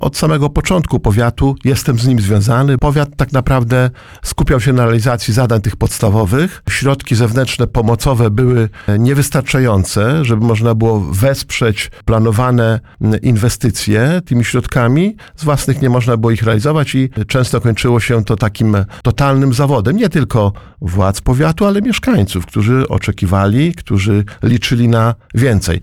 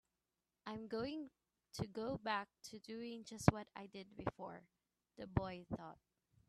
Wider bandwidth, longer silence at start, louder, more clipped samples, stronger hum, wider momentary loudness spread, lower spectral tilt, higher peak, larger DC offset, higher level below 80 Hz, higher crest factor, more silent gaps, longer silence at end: first, 16.5 kHz vs 13 kHz; second, 0 s vs 0.65 s; first, -13 LUFS vs -45 LUFS; neither; neither; second, 4 LU vs 18 LU; about the same, -6.5 dB/octave vs -6 dB/octave; first, -2 dBFS vs -12 dBFS; neither; first, -28 dBFS vs -62 dBFS; second, 10 dB vs 34 dB; neither; second, 0 s vs 0.55 s